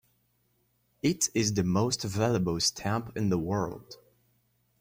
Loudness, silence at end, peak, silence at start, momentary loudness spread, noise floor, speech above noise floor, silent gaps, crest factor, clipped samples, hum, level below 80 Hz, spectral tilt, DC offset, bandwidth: -29 LUFS; 0.85 s; -14 dBFS; 1.05 s; 6 LU; -72 dBFS; 43 dB; none; 18 dB; under 0.1%; none; -58 dBFS; -4.5 dB/octave; under 0.1%; 16.5 kHz